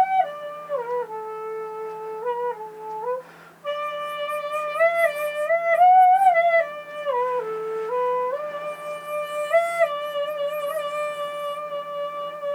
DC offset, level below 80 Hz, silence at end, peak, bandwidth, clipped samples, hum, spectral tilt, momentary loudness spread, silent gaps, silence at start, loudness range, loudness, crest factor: under 0.1%; -78 dBFS; 0 s; -8 dBFS; 17.5 kHz; under 0.1%; none; -2.5 dB/octave; 15 LU; none; 0 s; 11 LU; -24 LUFS; 16 dB